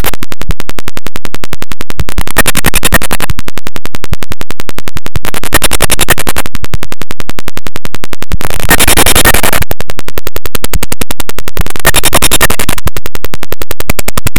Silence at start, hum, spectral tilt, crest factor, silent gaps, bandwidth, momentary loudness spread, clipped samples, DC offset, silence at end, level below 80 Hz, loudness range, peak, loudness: 0 s; none; -2.5 dB/octave; 18 dB; none; over 20 kHz; 16 LU; 7%; 90%; 0 s; -20 dBFS; 4 LU; 0 dBFS; -12 LUFS